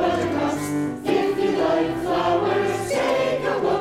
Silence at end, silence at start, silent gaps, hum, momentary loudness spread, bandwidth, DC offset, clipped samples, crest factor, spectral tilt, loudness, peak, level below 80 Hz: 0 s; 0 s; none; none; 3 LU; 16 kHz; under 0.1%; under 0.1%; 12 dB; -5.5 dB/octave; -22 LUFS; -8 dBFS; -50 dBFS